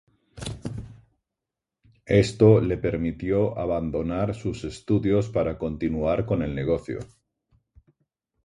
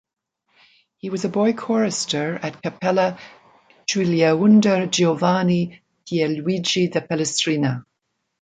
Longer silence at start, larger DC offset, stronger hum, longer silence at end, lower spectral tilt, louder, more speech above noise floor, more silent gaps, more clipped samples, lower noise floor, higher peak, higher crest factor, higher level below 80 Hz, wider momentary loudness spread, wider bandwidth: second, 0.35 s vs 1.05 s; neither; neither; first, 1.4 s vs 0.6 s; first, -7.5 dB/octave vs -5 dB/octave; second, -24 LUFS vs -20 LUFS; first, 64 dB vs 56 dB; neither; neither; first, -87 dBFS vs -76 dBFS; about the same, -4 dBFS vs -4 dBFS; about the same, 20 dB vs 18 dB; first, -44 dBFS vs -64 dBFS; first, 18 LU vs 12 LU; first, 11.5 kHz vs 9.4 kHz